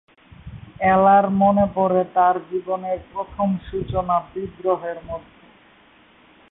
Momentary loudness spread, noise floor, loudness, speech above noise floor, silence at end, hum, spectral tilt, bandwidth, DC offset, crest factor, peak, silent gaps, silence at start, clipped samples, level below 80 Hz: 17 LU; -53 dBFS; -20 LUFS; 33 dB; 1.3 s; none; -12 dB/octave; 4 kHz; under 0.1%; 16 dB; -6 dBFS; none; 0.45 s; under 0.1%; -46 dBFS